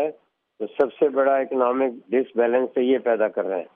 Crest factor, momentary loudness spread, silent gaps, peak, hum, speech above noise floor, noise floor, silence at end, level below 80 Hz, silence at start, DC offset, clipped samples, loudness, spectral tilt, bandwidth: 16 dB; 6 LU; none; -6 dBFS; none; 28 dB; -50 dBFS; 0.1 s; -76 dBFS; 0 s; under 0.1%; under 0.1%; -22 LUFS; -3.5 dB/octave; 3.7 kHz